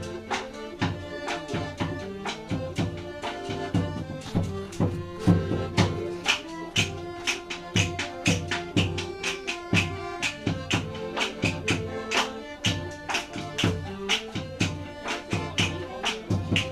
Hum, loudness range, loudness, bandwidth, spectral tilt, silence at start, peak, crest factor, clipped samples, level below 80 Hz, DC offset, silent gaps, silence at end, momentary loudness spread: none; 5 LU; -28 LUFS; 15 kHz; -4.5 dB/octave; 0 s; -6 dBFS; 22 dB; under 0.1%; -48 dBFS; under 0.1%; none; 0 s; 7 LU